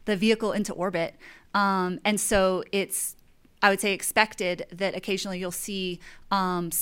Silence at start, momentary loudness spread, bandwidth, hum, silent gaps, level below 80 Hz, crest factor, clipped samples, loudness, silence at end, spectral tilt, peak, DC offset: 0.05 s; 8 LU; 17 kHz; none; none; -52 dBFS; 24 dB; under 0.1%; -26 LUFS; 0 s; -3.5 dB/octave; -4 dBFS; under 0.1%